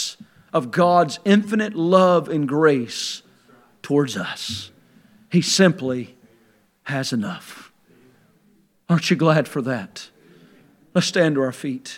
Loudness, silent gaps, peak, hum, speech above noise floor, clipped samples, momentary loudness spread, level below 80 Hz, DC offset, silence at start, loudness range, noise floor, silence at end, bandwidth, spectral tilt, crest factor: -20 LUFS; none; 0 dBFS; none; 40 dB; under 0.1%; 16 LU; -72 dBFS; under 0.1%; 0 s; 5 LU; -59 dBFS; 0 s; 16 kHz; -5 dB/octave; 22 dB